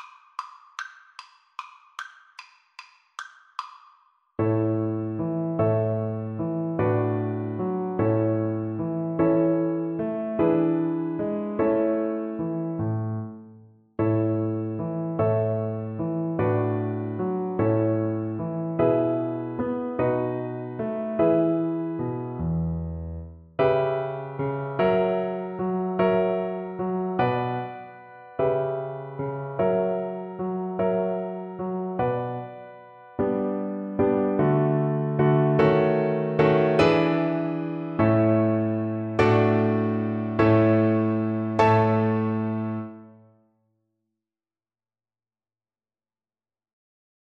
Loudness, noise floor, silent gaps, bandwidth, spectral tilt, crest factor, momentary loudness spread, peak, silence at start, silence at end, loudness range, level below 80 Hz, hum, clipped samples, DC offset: -25 LUFS; under -90 dBFS; none; 7 kHz; -9 dB/octave; 20 dB; 17 LU; -6 dBFS; 0 s; 4.25 s; 7 LU; -54 dBFS; none; under 0.1%; under 0.1%